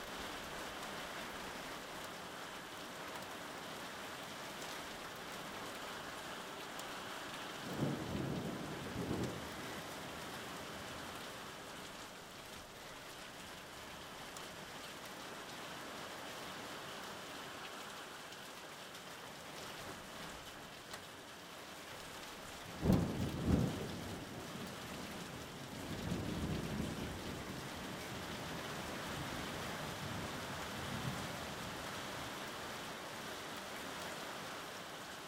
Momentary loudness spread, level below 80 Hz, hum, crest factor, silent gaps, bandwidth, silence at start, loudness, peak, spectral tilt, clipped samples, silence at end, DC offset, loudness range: 8 LU; -60 dBFS; none; 28 dB; none; 16 kHz; 0 s; -45 LUFS; -18 dBFS; -4.5 dB/octave; under 0.1%; 0 s; under 0.1%; 9 LU